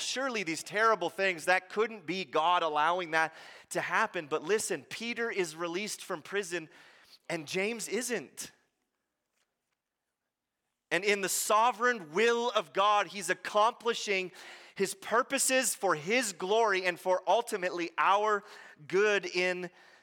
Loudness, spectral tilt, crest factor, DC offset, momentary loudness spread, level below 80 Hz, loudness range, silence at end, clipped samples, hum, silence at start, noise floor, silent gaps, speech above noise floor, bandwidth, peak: -30 LUFS; -2 dB/octave; 22 dB; under 0.1%; 10 LU; -84 dBFS; 9 LU; 0.35 s; under 0.1%; none; 0 s; -87 dBFS; none; 57 dB; 17 kHz; -10 dBFS